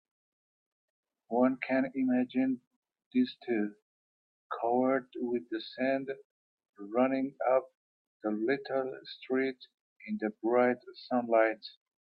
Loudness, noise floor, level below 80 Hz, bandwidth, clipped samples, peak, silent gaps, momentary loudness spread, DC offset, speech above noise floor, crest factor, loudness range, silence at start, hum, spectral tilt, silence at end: -32 LUFS; under -90 dBFS; -82 dBFS; 5.4 kHz; under 0.1%; -12 dBFS; 2.67-2.82 s, 3.06-3.11 s, 3.82-4.50 s, 6.25-6.58 s, 6.69-6.73 s, 7.77-8.20 s, 9.74-10.00 s; 12 LU; under 0.1%; over 59 dB; 20 dB; 2 LU; 1.3 s; none; -8.5 dB/octave; 0.35 s